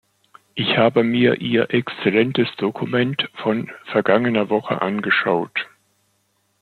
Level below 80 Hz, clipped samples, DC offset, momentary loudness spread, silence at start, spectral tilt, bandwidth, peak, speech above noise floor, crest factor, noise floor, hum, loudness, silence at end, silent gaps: -64 dBFS; under 0.1%; under 0.1%; 8 LU; 0.55 s; -7.5 dB/octave; 6.2 kHz; -2 dBFS; 47 dB; 18 dB; -66 dBFS; none; -19 LUFS; 0.95 s; none